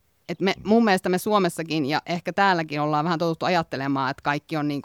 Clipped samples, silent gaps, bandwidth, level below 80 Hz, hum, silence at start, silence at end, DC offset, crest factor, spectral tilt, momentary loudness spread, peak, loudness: under 0.1%; none; 17.5 kHz; -62 dBFS; none; 0.3 s; 0 s; under 0.1%; 18 dB; -5.5 dB/octave; 6 LU; -6 dBFS; -23 LUFS